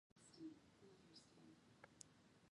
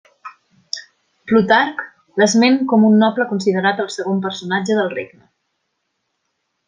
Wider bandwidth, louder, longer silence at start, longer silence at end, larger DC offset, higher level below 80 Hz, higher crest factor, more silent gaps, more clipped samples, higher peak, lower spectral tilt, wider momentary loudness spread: first, 11 kHz vs 9.8 kHz; second, -65 LUFS vs -16 LUFS; about the same, 0.15 s vs 0.25 s; second, 0 s vs 1.6 s; neither; second, -90 dBFS vs -64 dBFS; first, 30 dB vs 16 dB; neither; neither; second, -34 dBFS vs -2 dBFS; about the same, -4 dB/octave vs -5 dB/octave; second, 9 LU vs 16 LU